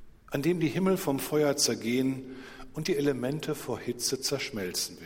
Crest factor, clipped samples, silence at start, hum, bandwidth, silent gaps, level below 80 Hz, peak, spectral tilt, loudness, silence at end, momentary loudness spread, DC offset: 18 dB; under 0.1%; 0 s; none; 16.5 kHz; none; -58 dBFS; -12 dBFS; -4 dB/octave; -29 LUFS; 0 s; 10 LU; under 0.1%